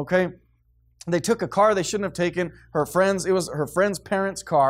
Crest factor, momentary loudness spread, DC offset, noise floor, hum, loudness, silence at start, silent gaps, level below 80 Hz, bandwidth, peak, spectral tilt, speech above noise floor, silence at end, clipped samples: 16 dB; 8 LU; under 0.1%; -62 dBFS; none; -23 LUFS; 0 s; none; -54 dBFS; 16 kHz; -8 dBFS; -5 dB/octave; 39 dB; 0 s; under 0.1%